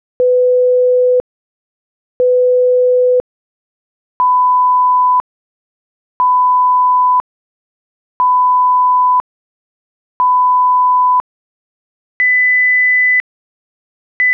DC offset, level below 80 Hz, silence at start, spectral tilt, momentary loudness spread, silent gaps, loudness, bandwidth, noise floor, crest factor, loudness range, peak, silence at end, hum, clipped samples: under 0.1%; -60 dBFS; 0.2 s; -1 dB/octave; 8 LU; 1.20-2.20 s, 3.20-4.20 s, 5.20-6.20 s, 7.20-8.20 s, 9.20-10.20 s, 11.20-12.20 s, 13.20-14.20 s; -11 LUFS; 3.2 kHz; under -90 dBFS; 6 dB; 3 LU; -8 dBFS; 0 s; none; under 0.1%